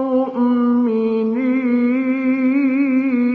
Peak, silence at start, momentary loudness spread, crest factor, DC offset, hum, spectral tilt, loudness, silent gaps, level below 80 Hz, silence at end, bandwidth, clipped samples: -8 dBFS; 0 s; 2 LU; 8 dB; under 0.1%; none; -9 dB/octave; -17 LUFS; none; -64 dBFS; 0 s; 4.5 kHz; under 0.1%